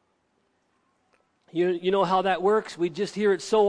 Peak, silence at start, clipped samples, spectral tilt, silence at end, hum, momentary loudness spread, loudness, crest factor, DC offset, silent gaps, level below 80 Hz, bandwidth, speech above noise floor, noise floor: -10 dBFS; 1.55 s; under 0.1%; -5.5 dB/octave; 0 s; none; 6 LU; -25 LUFS; 16 dB; under 0.1%; none; -66 dBFS; 10.5 kHz; 47 dB; -71 dBFS